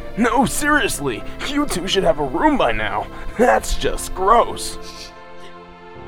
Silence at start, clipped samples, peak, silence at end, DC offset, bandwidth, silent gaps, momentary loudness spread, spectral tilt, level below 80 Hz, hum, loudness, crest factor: 0 s; under 0.1%; -2 dBFS; 0 s; under 0.1%; 17 kHz; none; 20 LU; -3.5 dB/octave; -30 dBFS; none; -19 LUFS; 18 dB